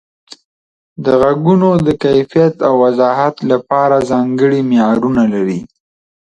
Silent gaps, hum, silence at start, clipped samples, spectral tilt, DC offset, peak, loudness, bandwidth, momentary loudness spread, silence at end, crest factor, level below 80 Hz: 0.45-0.96 s; none; 0.3 s; under 0.1%; -8 dB/octave; under 0.1%; 0 dBFS; -12 LUFS; 9.2 kHz; 4 LU; 0.65 s; 12 dB; -48 dBFS